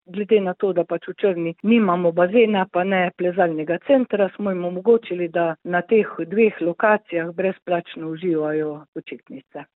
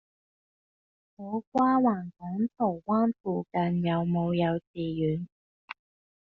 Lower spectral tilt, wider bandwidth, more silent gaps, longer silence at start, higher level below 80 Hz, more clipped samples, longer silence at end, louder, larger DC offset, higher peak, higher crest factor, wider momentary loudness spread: first, -11 dB/octave vs -7 dB/octave; second, 4.1 kHz vs 5 kHz; second, 7.62-7.66 s, 8.88-8.93 s vs 1.47-1.52 s, 3.20-3.24 s, 4.67-4.74 s, 5.32-5.68 s; second, 0.1 s vs 1.2 s; second, -70 dBFS vs -64 dBFS; neither; second, 0.15 s vs 0.5 s; first, -21 LUFS vs -28 LUFS; neither; first, -4 dBFS vs -14 dBFS; about the same, 16 dB vs 16 dB; second, 9 LU vs 20 LU